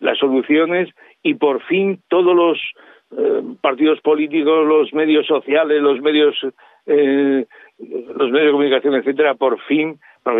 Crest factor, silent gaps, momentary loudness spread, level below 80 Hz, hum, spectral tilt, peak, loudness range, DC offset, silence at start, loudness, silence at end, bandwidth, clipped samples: 14 dB; none; 11 LU; -76 dBFS; none; -8.5 dB/octave; -2 dBFS; 2 LU; under 0.1%; 0 s; -16 LUFS; 0 s; 4 kHz; under 0.1%